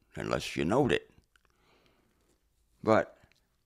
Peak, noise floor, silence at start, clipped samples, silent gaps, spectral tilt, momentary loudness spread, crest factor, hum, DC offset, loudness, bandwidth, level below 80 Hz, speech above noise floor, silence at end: -10 dBFS; -71 dBFS; 0.15 s; under 0.1%; none; -6 dB/octave; 7 LU; 22 dB; none; under 0.1%; -30 LUFS; 15.5 kHz; -58 dBFS; 43 dB; 0.55 s